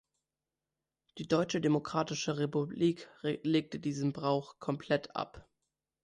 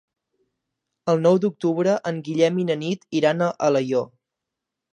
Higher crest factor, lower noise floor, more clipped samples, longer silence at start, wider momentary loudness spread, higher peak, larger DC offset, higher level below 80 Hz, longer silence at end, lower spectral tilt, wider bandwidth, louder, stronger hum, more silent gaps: about the same, 18 dB vs 18 dB; first, under -90 dBFS vs -84 dBFS; neither; about the same, 1.15 s vs 1.05 s; about the same, 8 LU vs 7 LU; second, -16 dBFS vs -4 dBFS; neither; about the same, -70 dBFS vs -74 dBFS; second, 0.6 s vs 0.85 s; about the same, -6 dB/octave vs -6.5 dB/octave; about the same, 10.5 kHz vs 9.8 kHz; second, -34 LUFS vs -22 LUFS; neither; neither